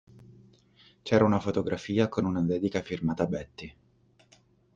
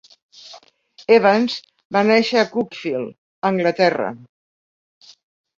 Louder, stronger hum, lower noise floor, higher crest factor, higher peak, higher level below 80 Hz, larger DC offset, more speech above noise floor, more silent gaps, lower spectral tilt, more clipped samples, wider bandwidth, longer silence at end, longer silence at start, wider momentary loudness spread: second, -28 LUFS vs -18 LUFS; neither; first, -64 dBFS vs -50 dBFS; about the same, 20 dB vs 18 dB; second, -10 dBFS vs -2 dBFS; first, -58 dBFS vs -66 dBFS; neither; about the same, 36 dB vs 33 dB; second, none vs 1.85-1.90 s, 3.18-3.42 s; first, -7.5 dB/octave vs -5.5 dB/octave; neither; about the same, 7.6 kHz vs 7.6 kHz; second, 1.05 s vs 1.4 s; second, 0.3 s vs 0.45 s; first, 20 LU vs 15 LU